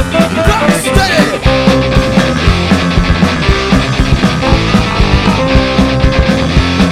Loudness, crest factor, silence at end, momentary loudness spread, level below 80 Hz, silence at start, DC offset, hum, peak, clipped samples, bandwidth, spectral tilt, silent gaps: -10 LUFS; 10 dB; 0 s; 2 LU; -16 dBFS; 0 s; under 0.1%; none; 0 dBFS; under 0.1%; 15 kHz; -5.5 dB/octave; none